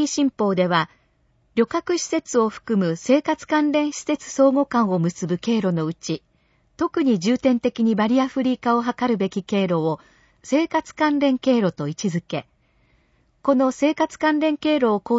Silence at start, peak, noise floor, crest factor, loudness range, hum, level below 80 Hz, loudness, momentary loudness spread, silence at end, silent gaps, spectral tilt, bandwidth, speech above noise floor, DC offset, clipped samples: 0 s; -4 dBFS; -63 dBFS; 18 dB; 2 LU; none; -62 dBFS; -21 LUFS; 7 LU; 0 s; none; -5.5 dB/octave; 8 kHz; 42 dB; under 0.1%; under 0.1%